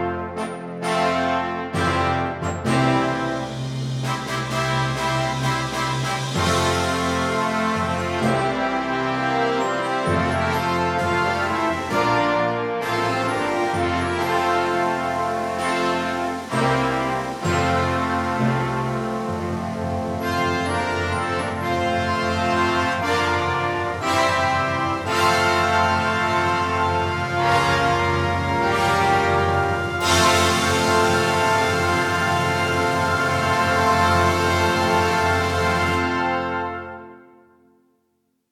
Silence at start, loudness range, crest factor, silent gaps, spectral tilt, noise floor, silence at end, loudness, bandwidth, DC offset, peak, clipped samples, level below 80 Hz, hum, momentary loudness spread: 0 s; 4 LU; 16 dB; none; -4.5 dB/octave; -69 dBFS; 1.35 s; -21 LUFS; 16.5 kHz; under 0.1%; -4 dBFS; under 0.1%; -48 dBFS; none; 7 LU